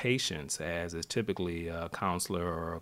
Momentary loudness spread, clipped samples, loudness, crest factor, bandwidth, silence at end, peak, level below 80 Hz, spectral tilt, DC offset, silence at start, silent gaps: 4 LU; under 0.1%; -34 LUFS; 18 dB; 16 kHz; 0 s; -16 dBFS; -54 dBFS; -4 dB/octave; under 0.1%; 0 s; none